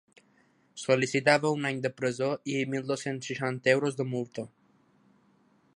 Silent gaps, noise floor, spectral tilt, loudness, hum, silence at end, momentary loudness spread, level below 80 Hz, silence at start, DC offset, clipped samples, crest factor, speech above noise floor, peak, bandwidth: none; -66 dBFS; -5 dB/octave; -29 LUFS; none; 1.3 s; 14 LU; -76 dBFS; 0.75 s; under 0.1%; under 0.1%; 24 dB; 37 dB; -6 dBFS; 11.5 kHz